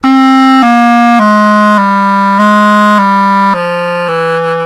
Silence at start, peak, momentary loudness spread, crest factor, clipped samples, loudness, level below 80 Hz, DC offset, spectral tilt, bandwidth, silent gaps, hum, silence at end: 0.05 s; 0 dBFS; 6 LU; 6 dB; under 0.1%; -7 LUFS; -56 dBFS; under 0.1%; -6 dB/octave; 14.5 kHz; none; none; 0 s